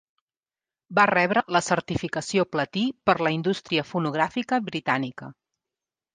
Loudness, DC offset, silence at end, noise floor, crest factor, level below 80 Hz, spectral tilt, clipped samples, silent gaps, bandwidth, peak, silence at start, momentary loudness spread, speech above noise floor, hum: -24 LUFS; under 0.1%; 0.8 s; under -90 dBFS; 20 dB; -60 dBFS; -5 dB/octave; under 0.1%; none; 9.8 kHz; -6 dBFS; 0.9 s; 7 LU; over 66 dB; none